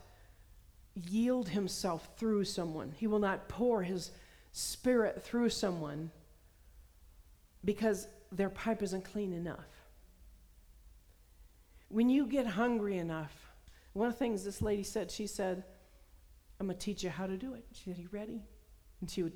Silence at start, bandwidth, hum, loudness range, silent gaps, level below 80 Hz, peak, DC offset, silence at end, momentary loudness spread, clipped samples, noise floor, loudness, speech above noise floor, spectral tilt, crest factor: 0 s; over 20 kHz; none; 7 LU; none; -58 dBFS; -20 dBFS; under 0.1%; 0 s; 14 LU; under 0.1%; -62 dBFS; -36 LUFS; 26 dB; -5 dB/octave; 18 dB